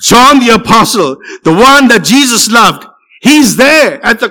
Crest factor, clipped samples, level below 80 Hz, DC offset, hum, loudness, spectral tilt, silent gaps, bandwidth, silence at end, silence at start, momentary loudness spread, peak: 6 dB; 2%; -38 dBFS; under 0.1%; none; -5 LUFS; -3 dB/octave; none; 20 kHz; 0 s; 0 s; 9 LU; 0 dBFS